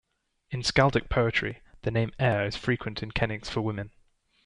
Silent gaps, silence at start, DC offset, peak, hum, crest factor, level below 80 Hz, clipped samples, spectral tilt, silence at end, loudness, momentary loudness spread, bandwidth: none; 0.5 s; under 0.1%; -8 dBFS; none; 22 dB; -46 dBFS; under 0.1%; -5.5 dB/octave; 0.55 s; -28 LUFS; 12 LU; 10.5 kHz